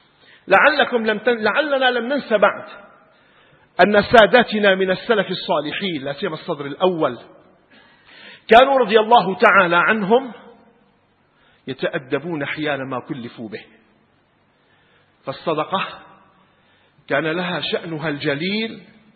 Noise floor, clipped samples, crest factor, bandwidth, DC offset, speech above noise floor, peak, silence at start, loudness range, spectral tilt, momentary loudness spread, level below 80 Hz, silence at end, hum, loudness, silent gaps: -60 dBFS; under 0.1%; 20 dB; 8.6 kHz; under 0.1%; 42 dB; 0 dBFS; 0.45 s; 13 LU; -6.5 dB/octave; 19 LU; -56 dBFS; 0.35 s; none; -17 LUFS; none